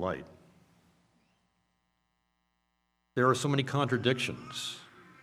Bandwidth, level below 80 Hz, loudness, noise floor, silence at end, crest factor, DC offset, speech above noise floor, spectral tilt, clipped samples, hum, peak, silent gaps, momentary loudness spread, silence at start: 14.5 kHz; -72 dBFS; -31 LUFS; -78 dBFS; 0.2 s; 22 dB; under 0.1%; 48 dB; -5 dB/octave; under 0.1%; none; -12 dBFS; none; 12 LU; 0 s